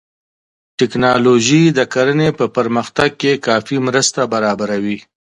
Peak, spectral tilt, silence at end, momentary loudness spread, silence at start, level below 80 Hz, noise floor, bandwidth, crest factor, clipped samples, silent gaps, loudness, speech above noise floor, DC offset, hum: 0 dBFS; -4.5 dB/octave; 0.4 s; 8 LU; 0.8 s; -50 dBFS; under -90 dBFS; 11.5 kHz; 16 dB; under 0.1%; none; -14 LUFS; over 76 dB; under 0.1%; none